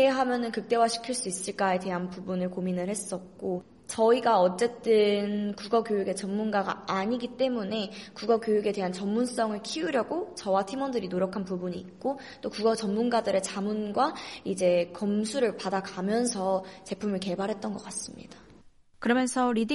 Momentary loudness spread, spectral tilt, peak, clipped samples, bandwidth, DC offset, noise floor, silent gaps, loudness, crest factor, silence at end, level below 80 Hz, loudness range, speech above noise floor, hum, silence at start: 10 LU; -4.5 dB/octave; -12 dBFS; under 0.1%; 11.5 kHz; under 0.1%; -55 dBFS; none; -29 LUFS; 16 dB; 0 s; -66 dBFS; 4 LU; 27 dB; none; 0 s